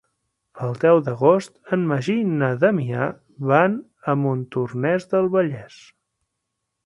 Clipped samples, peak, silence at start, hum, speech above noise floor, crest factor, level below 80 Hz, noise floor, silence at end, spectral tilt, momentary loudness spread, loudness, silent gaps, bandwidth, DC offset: under 0.1%; -2 dBFS; 0.55 s; none; 59 dB; 20 dB; -64 dBFS; -79 dBFS; 1.2 s; -8 dB/octave; 10 LU; -21 LUFS; none; 11.5 kHz; under 0.1%